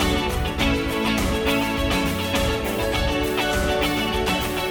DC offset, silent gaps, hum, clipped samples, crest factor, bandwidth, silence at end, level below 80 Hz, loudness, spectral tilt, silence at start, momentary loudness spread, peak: under 0.1%; none; none; under 0.1%; 14 dB; over 20 kHz; 0 s; -30 dBFS; -22 LUFS; -4.5 dB/octave; 0 s; 2 LU; -8 dBFS